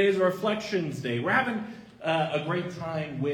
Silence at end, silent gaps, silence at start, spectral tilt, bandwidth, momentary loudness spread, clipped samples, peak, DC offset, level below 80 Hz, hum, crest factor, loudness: 0 s; none; 0 s; -6 dB/octave; 18.5 kHz; 8 LU; under 0.1%; -8 dBFS; under 0.1%; -66 dBFS; none; 20 dB; -28 LUFS